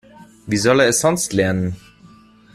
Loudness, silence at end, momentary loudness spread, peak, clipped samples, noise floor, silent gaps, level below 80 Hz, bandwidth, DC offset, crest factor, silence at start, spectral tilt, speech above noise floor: -17 LUFS; 0.75 s; 11 LU; -2 dBFS; under 0.1%; -47 dBFS; none; -50 dBFS; 15.5 kHz; under 0.1%; 18 dB; 0.2 s; -4 dB/octave; 30 dB